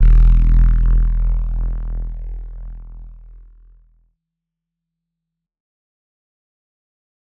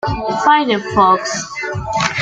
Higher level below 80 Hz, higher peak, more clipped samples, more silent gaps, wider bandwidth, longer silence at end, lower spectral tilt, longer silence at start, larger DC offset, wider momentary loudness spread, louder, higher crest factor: first, -18 dBFS vs -38 dBFS; about the same, -2 dBFS vs -2 dBFS; neither; neither; second, 2 kHz vs 9.4 kHz; first, 4.25 s vs 0 s; first, -10 dB/octave vs -4 dB/octave; about the same, 0 s vs 0.05 s; neither; first, 22 LU vs 9 LU; second, -19 LUFS vs -15 LUFS; about the same, 14 dB vs 14 dB